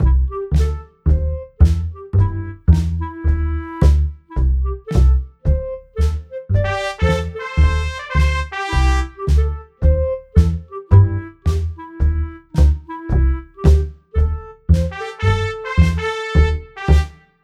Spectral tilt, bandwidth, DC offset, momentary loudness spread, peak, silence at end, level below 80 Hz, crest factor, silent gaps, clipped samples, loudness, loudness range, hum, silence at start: -7.5 dB/octave; 8.8 kHz; under 0.1%; 7 LU; 0 dBFS; 0.3 s; -18 dBFS; 16 dB; none; under 0.1%; -19 LUFS; 2 LU; none; 0 s